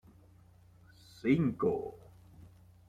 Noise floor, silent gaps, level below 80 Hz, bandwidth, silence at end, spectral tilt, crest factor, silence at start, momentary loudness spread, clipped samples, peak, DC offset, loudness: -60 dBFS; none; -64 dBFS; 11.5 kHz; 0.4 s; -8.5 dB/octave; 20 dB; 1.25 s; 17 LU; under 0.1%; -16 dBFS; under 0.1%; -33 LUFS